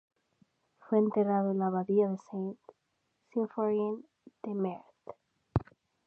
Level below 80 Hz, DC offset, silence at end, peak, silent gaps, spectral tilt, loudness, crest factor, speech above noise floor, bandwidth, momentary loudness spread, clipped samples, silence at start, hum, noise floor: -56 dBFS; under 0.1%; 0.5 s; -12 dBFS; none; -10.5 dB/octave; -32 LUFS; 20 dB; 48 dB; 6.4 kHz; 18 LU; under 0.1%; 0.9 s; none; -78 dBFS